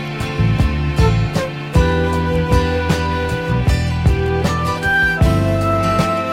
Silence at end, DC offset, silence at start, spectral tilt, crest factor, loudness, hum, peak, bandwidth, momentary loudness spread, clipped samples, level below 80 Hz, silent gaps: 0 s; under 0.1%; 0 s; -6.5 dB/octave; 14 dB; -17 LUFS; none; -2 dBFS; 16 kHz; 4 LU; under 0.1%; -22 dBFS; none